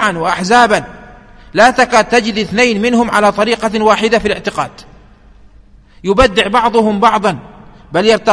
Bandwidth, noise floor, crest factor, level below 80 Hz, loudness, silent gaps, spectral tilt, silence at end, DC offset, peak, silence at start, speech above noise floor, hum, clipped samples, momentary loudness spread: 11 kHz; -42 dBFS; 12 dB; -36 dBFS; -12 LUFS; none; -4 dB/octave; 0 s; under 0.1%; 0 dBFS; 0 s; 31 dB; none; 0.2%; 10 LU